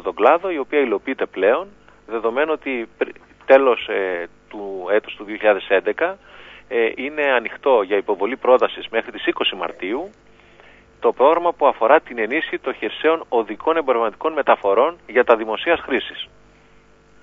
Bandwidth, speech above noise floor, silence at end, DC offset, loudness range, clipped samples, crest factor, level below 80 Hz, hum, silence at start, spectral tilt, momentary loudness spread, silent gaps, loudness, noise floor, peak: 4.8 kHz; 32 dB; 0.95 s; under 0.1%; 3 LU; under 0.1%; 20 dB; -58 dBFS; 50 Hz at -60 dBFS; 0 s; -5.5 dB/octave; 11 LU; none; -19 LUFS; -51 dBFS; 0 dBFS